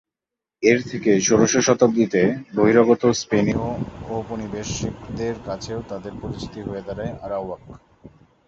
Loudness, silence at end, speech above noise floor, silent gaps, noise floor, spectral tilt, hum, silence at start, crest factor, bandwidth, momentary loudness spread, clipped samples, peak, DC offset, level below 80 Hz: -21 LUFS; 0.4 s; 66 dB; none; -87 dBFS; -5 dB/octave; none; 0.6 s; 20 dB; 7.6 kHz; 15 LU; under 0.1%; -2 dBFS; under 0.1%; -46 dBFS